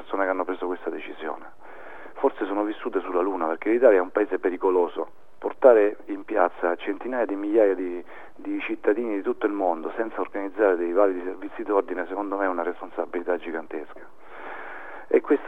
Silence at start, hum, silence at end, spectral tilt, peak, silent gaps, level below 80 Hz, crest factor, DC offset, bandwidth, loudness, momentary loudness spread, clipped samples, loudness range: 0 s; none; 0 s; -6.5 dB/octave; -2 dBFS; none; -68 dBFS; 22 dB; 1%; 3.9 kHz; -25 LUFS; 17 LU; under 0.1%; 7 LU